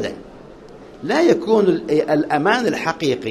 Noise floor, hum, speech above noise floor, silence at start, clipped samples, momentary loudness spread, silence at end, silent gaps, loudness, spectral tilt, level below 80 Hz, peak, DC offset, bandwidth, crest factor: -40 dBFS; none; 22 dB; 0 s; under 0.1%; 10 LU; 0 s; none; -18 LUFS; -5.5 dB/octave; -54 dBFS; 0 dBFS; under 0.1%; 13 kHz; 18 dB